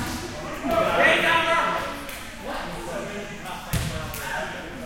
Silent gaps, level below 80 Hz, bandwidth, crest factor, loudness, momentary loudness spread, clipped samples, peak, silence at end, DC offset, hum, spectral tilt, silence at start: none; -42 dBFS; 17 kHz; 20 dB; -24 LUFS; 16 LU; under 0.1%; -6 dBFS; 0 s; under 0.1%; none; -4 dB/octave; 0 s